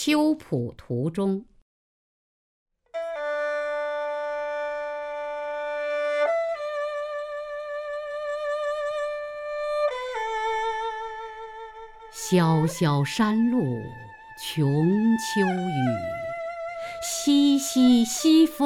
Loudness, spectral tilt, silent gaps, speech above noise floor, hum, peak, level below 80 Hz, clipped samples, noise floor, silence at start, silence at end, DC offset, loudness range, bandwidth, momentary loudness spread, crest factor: -26 LUFS; -5.5 dB/octave; 1.62-2.66 s; over 68 dB; none; -8 dBFS; -58 dBFS; under 0.1%; under -90 dBFS; 0 s; 0 s; under 0.1%; 7 LU; 17.5 kHz; 14 LU; 18 dB